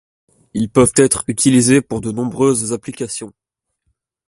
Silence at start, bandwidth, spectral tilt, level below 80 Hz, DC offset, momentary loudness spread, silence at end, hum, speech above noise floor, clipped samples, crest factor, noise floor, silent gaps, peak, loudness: 0.55 s; 11.5 kHz; -4.5 dB/octave; -46 dBFS; under 0.1%; 13 LU; 1 s; none; 55 dB; under 0.1%; 16 dB; -70 dBFS; none; 0 dBFS; -15 LUFS